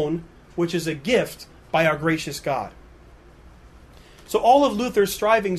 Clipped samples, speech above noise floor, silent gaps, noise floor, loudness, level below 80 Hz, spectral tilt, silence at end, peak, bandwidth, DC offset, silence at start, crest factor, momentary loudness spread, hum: under 0.1%; 27 dB; none; -48 dBFS; -22 LUFS; -50 dBFS; -5 dB/octave; 0 s; -4 dBFS; 13.5 kHz; under 0.1%; 0 s; 18 dB; 14 LU; none